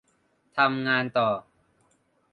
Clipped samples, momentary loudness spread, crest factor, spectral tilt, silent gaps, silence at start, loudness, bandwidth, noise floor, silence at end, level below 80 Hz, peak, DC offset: under 0.1%; 10 LU; 22 dB; -7 dB/octave; none; 0.55 s; -25 LUFS; 9.4 kHz; -68 dBFS; 0.95 s; -70 dBFS; -6 dBFS; under 0.1%